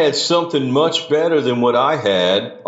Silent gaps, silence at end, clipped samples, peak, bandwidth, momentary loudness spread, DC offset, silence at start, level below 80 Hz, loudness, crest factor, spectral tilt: none; 0.05 s; under 0.1%; -4 dBFS; 8 kHz; 2 LU; under 0.1%; 0 s; -68 dBFS; -16 LUFS; 14 dB; -4.5 dB/octave